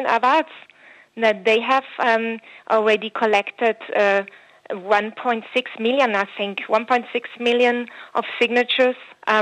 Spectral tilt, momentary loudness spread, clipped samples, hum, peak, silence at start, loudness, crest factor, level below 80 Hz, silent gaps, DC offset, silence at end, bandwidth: -4 dB/octave; 9 LU; under 0.1%; none; -4 dBFS; 0 s; -20 LUFS; 16 dB; -78 dBFS; none; under 0.1%; 0 s; 10 kHz